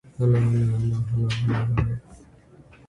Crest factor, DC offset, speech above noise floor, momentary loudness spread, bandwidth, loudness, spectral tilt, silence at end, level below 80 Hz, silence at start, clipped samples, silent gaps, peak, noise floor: 14 dB; under 0.1%; 29 dB; 5 LU; 10 kHz; -23 LUFS; -8 dB/octave; 0.7 s; -42 dBFS; 0.2 s; under 0.1%; none; -10 dBFS; -51 dBFS